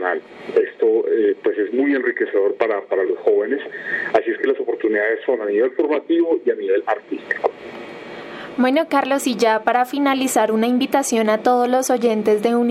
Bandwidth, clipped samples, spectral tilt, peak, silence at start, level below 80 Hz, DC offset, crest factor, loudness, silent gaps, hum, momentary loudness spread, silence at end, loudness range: 16 kHz; under 0.1%; -4 dB/octave; -2 dBFS; 0 s; -72 dBFS; under 0.1%; 16 dB; -19 LUFS; none; none; 8 LU; 0 s; 3 LU